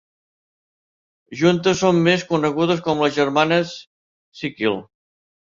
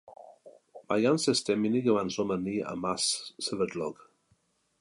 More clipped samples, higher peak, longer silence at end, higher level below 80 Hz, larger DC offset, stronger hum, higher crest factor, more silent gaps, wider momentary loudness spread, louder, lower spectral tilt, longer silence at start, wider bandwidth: neither; first, -2 dBFS vs -12 dBFS; about the same, 0.75 s vs 0.85 s; first, -58 dBFS vs -68 dBFS; neither; neither; about the same, 18 dB vs 18 dB; first, 3.87-4.32 s vs none; first, 13 LU vs 7 LU; first, -19 LUFS vs -29 LUFS; first, -5.5 dB/octave vs -4 dB/octave; first, 1.3 s vs 0.1 s; second, 7.6 kHz vs 11.5 kHz